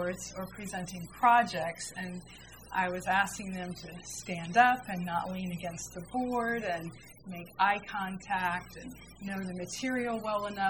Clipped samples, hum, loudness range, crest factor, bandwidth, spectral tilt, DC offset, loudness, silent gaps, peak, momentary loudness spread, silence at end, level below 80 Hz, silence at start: under 0.1%; none; 3 LU; 24 dB; 19 kHz; -4 dB/octave; under 0.1%; -32 LUFS; none; -10 dBFS; 19 LU; 0 s; -60 dBFS; 0 s